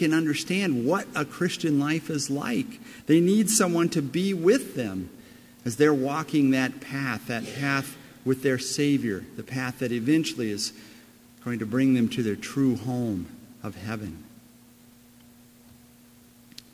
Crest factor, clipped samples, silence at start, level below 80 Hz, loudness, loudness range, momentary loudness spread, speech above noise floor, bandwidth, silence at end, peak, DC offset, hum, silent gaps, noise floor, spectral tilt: 20 dB; under 0.1%; 0 s; -60 dBFS; -26 LUFS; 8 LU; 13 LU; 28 dB; 16 kHz; 2.45 s; -8 dBFS; under 0.1%; none; none; -54 dBFS; -5 dB/octave